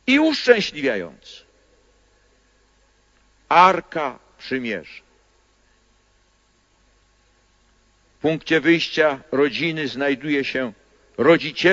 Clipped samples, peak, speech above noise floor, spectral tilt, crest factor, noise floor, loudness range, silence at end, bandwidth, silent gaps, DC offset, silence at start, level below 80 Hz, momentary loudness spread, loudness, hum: under 0.1%; 0 dBFS; 42 dB; -5 dB/octave; 22 dB; -61 dBFS; 12 LU; 0 s; 7.8 kHz; none; under 0.1%; 0.05 s; -60 dBFS; 15 LU; -20 LUFS; none